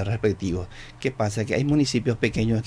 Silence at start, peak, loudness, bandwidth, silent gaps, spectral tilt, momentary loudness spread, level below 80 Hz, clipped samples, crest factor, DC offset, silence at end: 0 s; -8 dBFS; -25 LUFS; 11 kHz; none; -6 dB/octave; 9 LU; -44 dBFS; under 0.1%; 16 dB; under 0.1%; 0 s